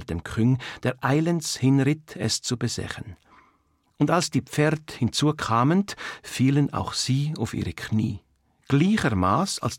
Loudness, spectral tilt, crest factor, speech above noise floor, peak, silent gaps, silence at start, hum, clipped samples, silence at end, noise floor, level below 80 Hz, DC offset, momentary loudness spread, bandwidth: -24 LUFS; -5.5 dB/octave; 16 dB; 42 dB; -8 dBFS; none; 0 s; none; under 0.1%; 0 s; -66 dBFS; -54 dBFS; under 0.1%; 10 LU; 16.5 kHz